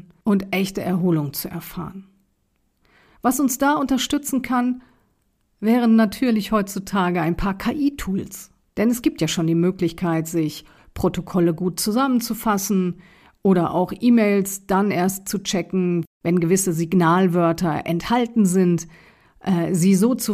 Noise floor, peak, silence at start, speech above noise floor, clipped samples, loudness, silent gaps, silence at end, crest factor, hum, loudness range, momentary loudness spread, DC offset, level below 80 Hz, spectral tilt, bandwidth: -67 dBFS; -6 dBFS; 0.25 s; 47 dB; under 0.1%; -21 LUFS; 16.07-16.21 s; 0 s; 14 dB; none; 3 LU; 10 LU; under 0.1%; -46 dBFS; -5.5 dB/octave; 15.5 kHz